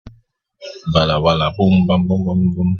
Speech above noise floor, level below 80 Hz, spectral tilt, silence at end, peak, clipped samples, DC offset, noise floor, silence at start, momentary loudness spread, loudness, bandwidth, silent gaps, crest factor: 39 dB; -40 dBFS; -8 dB/octave; 0 s; 0 dBFS; under 0.1%; under 0.1%; -54 dBFS; 0.05 s; 14 LU; -16 LUFS; 6.8 kHz; none; 16 dB